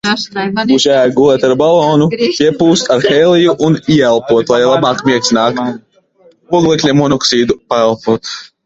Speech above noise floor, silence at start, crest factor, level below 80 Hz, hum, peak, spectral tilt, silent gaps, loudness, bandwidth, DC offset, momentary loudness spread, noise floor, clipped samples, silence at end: 37 dB; 0.05 s; 10 dB; -48 dBFS; none; 0 dBFS; -5 dB/octave; none; -11 LUFS; 8 kHz; under 0.1%; 7 LU; -47 dBFS; under 0.1%; 0.2 s